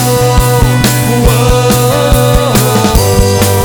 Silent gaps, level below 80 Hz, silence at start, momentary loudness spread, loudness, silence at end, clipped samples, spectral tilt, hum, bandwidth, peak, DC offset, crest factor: none; -16 dBFS; 0 s; 1 LU; -8 LUFS; 0 s; 1%; -5 dB/octave; none; over 20 kHz; 0 dBFS; under 0.1%; 8 dB